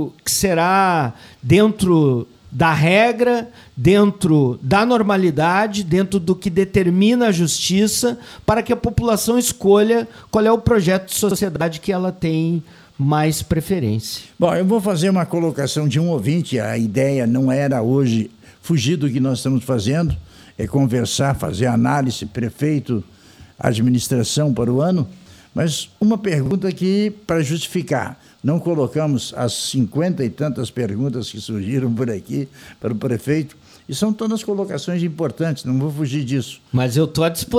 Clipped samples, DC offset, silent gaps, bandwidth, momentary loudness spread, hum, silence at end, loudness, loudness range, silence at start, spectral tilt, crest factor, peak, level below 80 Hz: under 0.1%; under 0.1%; none; 16 kHz; 9 LU; none; 0 s; -18 LUFS; 6 LU; 0 s; -5.5 dB/octave; 16 dB; -2 dBFS; -44 dBFS